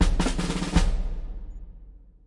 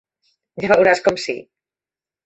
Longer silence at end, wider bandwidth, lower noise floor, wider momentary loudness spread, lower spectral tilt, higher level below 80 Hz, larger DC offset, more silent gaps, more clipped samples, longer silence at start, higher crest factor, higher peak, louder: second, 0.3 s vs 0.85 s; first, 11.5 kHz vs 8.2 kHz; second, -47 dBFS vs under -90 dBFS; first, 20 LU vs 17 LU; about the same, -5 dB/octave vs -4.5 dB/octave; first, -28 dBFS vs -58 dBFS; neither; neither; neither; second, 0 s vs 0.55 s; about the same, 18 dB vs 18 dB; second, -6 dBFS vs -2 dBFS; second, -28 LUFS vs -17 LUFS